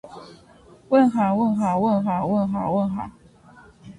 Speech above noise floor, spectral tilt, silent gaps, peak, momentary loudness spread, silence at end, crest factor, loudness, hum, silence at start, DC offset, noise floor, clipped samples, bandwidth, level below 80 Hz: 28 dB; -8.5 dB/octave; none; -6 dBFS; 16 LU; 0.05 s; 16 dB; -21 LUFS; none; 0.05 s; under 0.1%; -50 dBFS; under 0.1%; 10.5 kHz; -54 dBFS